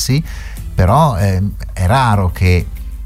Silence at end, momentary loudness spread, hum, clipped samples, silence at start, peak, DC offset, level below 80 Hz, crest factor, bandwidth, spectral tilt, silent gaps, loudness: 0 s; 13 LU; none; under 0.1%; 0 s; 0 dBFS; under 0.1%; -24 dBFS; 14 dB; 15.5 kHz; -6 dB/octave; none; -14 LUFS